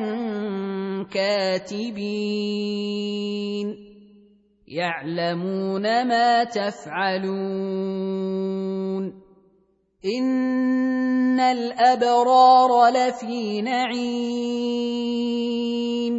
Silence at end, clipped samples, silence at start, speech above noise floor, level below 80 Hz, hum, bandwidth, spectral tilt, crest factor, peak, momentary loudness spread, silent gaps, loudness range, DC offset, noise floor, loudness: 0 s; under 0.1%; 0 s; 42 dB; -68 dBFS; none; 8 kHz; -5.5 dB/octave; 18 dB; -4 dBFS; 11 LU; none; 10 LU; under 0.1%; -63 dBFS; -22 LUFS